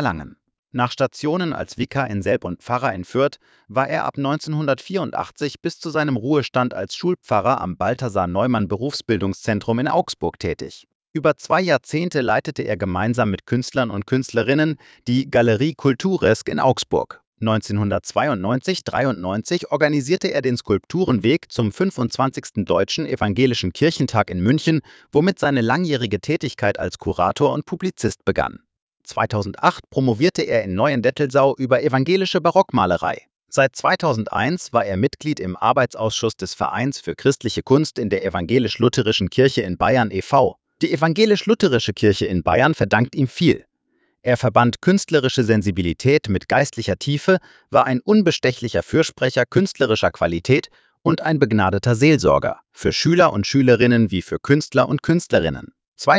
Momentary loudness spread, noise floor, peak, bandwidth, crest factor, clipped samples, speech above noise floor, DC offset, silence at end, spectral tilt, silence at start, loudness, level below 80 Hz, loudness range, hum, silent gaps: 7 LU; -67 dBFS; 0 dBFS; 8 kHz; 18 dB; under 0.1%; 48 dB; under 0.1%; 0 s; -6 dB/octave; 0 s; -20 LUFS; -44 dBFS; 4 LU; none; 0.59-0.63 s, 10.95-11.00 s, 11.10-11.14 s, 17.27-17.32 s, 28.82-28.87 s, 55.88-55.92 s